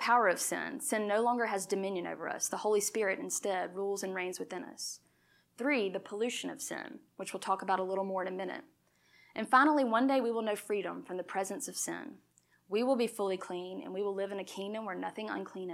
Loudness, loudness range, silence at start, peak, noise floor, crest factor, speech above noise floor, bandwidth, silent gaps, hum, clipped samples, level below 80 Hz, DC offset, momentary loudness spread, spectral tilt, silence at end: -34 LUFS; 5 LU; 0 s; -12 dBFS; -70 dBFS; 22 dB; 36 dB; 16 kHz; none; none; under 0.1%; -88 dBFS; under 0.1%; 12 LU; -3 dB/octave; 0 s